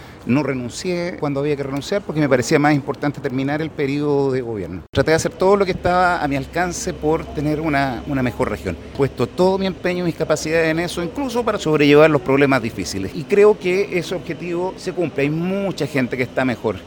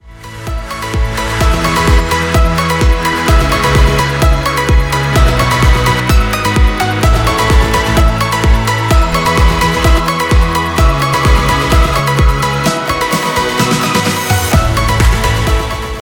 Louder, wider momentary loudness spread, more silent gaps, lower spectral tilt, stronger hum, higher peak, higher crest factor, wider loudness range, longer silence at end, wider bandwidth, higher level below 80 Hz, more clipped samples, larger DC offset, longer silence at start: second, -19 LUFS vs -12 LUFS; first, 9 LU vs 3 LU; first, 4.89-4.93 s vs none; about the same, -5.5 dB/octave vs -4.5 dB/octave; neither; about the same, 0 dBFS vs 0 dBFS; first, 18 dB vs 10 dB; first, 4 LU vs 1 LU; about the same, 0 s vs 0.05 s; about the same, 17.5 kHz vs 19 kHz; second, -42 dBFS vs -14 dBFS; neither; second, under 0.1% vs 0.2%; about the same, 0 s vs 0.05 s